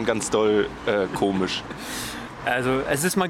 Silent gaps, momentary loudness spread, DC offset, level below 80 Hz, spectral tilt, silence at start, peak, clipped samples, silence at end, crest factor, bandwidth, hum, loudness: none; 9 LU; under 0.1%; -48 dBFS; -4 dB/octave; 0 s; -8 dBFS; under 0.1%; 0 s; 16 dB; 17 kHz; none; -24 LUFS